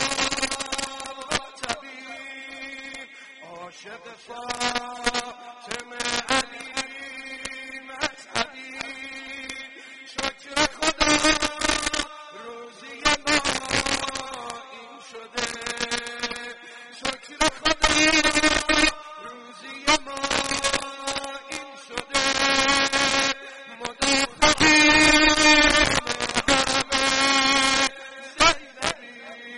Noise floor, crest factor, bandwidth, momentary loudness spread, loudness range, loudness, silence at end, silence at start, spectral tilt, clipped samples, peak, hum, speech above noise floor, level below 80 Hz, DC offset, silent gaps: -44 dBFS; 20 dB; 11.5 kHz; 22 LU; 14 LU; -21 LUFS; 0 s; 0 s; -1.5 dB/octave; under 0.1%; -4 dBFS; none; 13 dB; -44 dBFS; under 0.1%; none